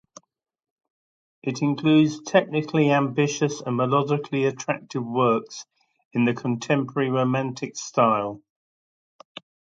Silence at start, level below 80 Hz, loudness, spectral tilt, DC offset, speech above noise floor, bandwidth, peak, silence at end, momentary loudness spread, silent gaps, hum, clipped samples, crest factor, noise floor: 1.45 s; -68 dBFS; -23 LUFS; -6 dB/octave; under 0.1%; over 67 dB; 7.8 kHz; -4 dBFS; 1.35 s; 13 LU; 6.05-6.11 s; none; under 0.1%; 20 dB; under -90 dBFS